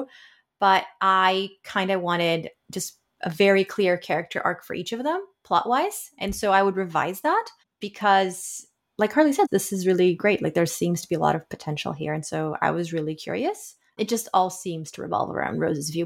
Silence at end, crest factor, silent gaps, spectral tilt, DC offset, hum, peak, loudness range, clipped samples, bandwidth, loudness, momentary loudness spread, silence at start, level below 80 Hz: 0 s; 18 dB; none; -4.5 dB/octave; under 0.1%; none; -6 dBFS; 4 LU; under 0.1%; 17 kHz; -24 LUFS; 12 LU; 0 s; -58 dBFS